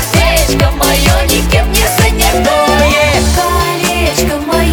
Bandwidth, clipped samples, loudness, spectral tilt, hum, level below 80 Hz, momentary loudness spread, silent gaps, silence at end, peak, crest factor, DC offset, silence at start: over 20 kHz; under 0.1%; -10 LUFS; -4 dB/octave; none; -16 dBFS; 3 LU; none; 0 s; 0 dBFS; 10 dB; under 0.1%; 0 s